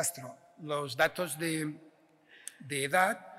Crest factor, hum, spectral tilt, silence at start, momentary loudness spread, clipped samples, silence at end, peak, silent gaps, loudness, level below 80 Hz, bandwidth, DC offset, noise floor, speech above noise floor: 20 dB; none; -3 dB/octave; 0 s; 20 LU; under 0.1%; 0 s; -14 dBFS; none; -32 LUFS; -74 dBFS; 16 kHz; under 0.1%; -61 dBFS; 29 dB